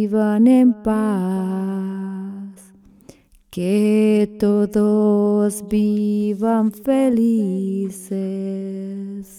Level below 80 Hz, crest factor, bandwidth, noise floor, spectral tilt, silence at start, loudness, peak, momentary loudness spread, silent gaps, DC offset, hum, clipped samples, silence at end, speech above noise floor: -52 dBFS; 14 dB; 14 kHz; -48 dBFS; -7.5 dB/octave; 0 s; -19 LUFS; -4 dBFS; 13 LU; none; under 0.1%; none; under 0.1%; 0 s; 30 dB